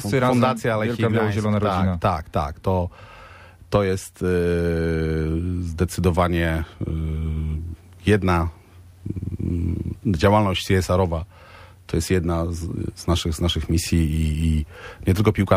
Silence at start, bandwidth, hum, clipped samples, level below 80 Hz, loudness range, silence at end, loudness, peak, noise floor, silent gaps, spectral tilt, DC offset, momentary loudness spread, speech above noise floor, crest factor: 0 s; 16 kHz; none; under 0.1%; -34 dBFS; 2 LU; 0 s; -22 LUFS; -4 dBFS; -45 dBFS; none; -6.5 dB/octave; under 0.1%; 9 LU; 23 dB; 18 dB